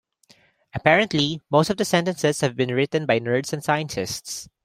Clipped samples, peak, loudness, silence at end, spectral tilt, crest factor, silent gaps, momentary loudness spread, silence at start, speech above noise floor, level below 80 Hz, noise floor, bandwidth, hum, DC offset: under 0.1%; 0 dBFS; -22 LUFS; 0.2 s; -4.5 dB/octave; 22 dB; none; 10 LU; 0.75 s; 36 dB; -58 dBFS; -58 dBFS; 16 kHz; none; under 0.1%